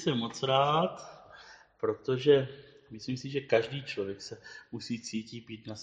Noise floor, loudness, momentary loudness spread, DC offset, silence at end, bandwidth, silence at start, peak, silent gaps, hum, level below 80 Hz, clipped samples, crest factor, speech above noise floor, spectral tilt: -54 dBFS; -31 LUFS; 23 LU; under 0.1%; 0 s; 9.4 kHz; 0 s; -12 dBFS; none; none; -70 dBFS; under 0.1%; 20 dB; 23 dB; -5.5 dB/octave